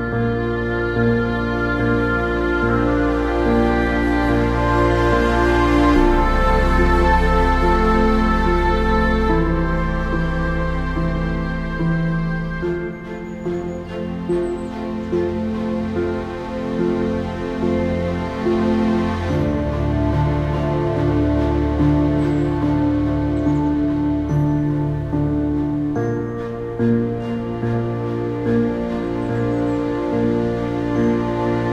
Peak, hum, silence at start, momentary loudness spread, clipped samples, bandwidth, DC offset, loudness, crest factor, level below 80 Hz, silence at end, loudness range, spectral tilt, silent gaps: -2 dBFS; none; 0 s; 7 LU; under 0.1%; 12 kHz; under 0.1%; -19 LUFS; 16 dB; -26 dBFS; 0 s; 7 LU; -8 dB/octave; none